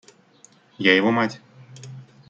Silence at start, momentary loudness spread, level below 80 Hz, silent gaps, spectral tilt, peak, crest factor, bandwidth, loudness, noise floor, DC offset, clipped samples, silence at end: 0.8 s; 25 LU; -68 dBFS; none; -5 dB/octave; -2 dBFS; 22 dB; 8.6 kHz; -20 LUFS; -54 dBFS; under 0.1%; under 0.1%; 0.3 s